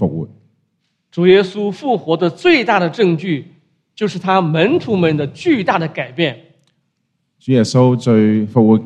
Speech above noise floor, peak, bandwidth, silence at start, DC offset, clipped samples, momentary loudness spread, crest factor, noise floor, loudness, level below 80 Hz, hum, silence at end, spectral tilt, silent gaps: 54 dB; 0 dBFS; 9.8 kHz; 0 s; under 0.1%; under 0.1%; 11 LU; 16 dB; -68 dBFS; -15 LUFS; -58 dBFS; none; 0 s; -7 dB/octave; none